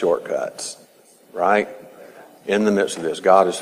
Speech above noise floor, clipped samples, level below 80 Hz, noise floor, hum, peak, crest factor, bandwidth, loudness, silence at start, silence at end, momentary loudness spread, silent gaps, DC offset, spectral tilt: 32 dB; under 0.1%; -68 dBFS; -51 dBFS; none; 0 dBFS; 20 dB; 15.5 kHz; -20 LUFS; 0 s; 0 s; 20 LU; none; under 0.1%; -4.5 dB/octave